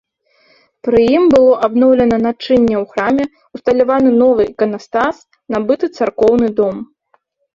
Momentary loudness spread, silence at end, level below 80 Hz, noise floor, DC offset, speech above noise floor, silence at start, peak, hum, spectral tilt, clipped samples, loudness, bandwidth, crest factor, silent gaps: 10 LU; 0.7 s; -46 dBFS; -60 dBFS; under 0.1%; 47 dB; 0.85 s; -2 dBFS; none; -7 dB/octave; under 0.1%; -13 LUFS; 7.4 kHz; 12 dB; none